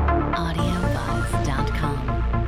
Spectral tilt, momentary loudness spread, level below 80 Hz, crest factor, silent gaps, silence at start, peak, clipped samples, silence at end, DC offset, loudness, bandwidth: -6.5 dB/octave; 2 LU; -26 dBFS; 14 dB; none; 0 s; -8 dBFS; under 0.1%; 0 s; under 0.1%; -24 LUFS; 15 kHz